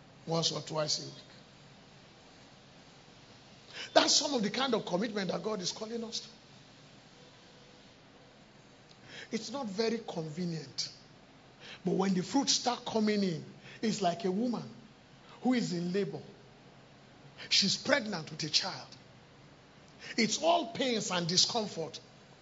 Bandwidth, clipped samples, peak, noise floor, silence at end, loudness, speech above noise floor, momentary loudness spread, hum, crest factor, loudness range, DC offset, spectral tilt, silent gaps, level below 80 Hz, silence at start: 8 kHz; under 0.1%; -6 dBFS; -58 dBFS; 0.1 s; -32 LUFS; 25 dB; 20 LU; none; 28 dB; 10 LU; under 0.1%; -3.5 dB/octave; none; -74 dBFS; 0 s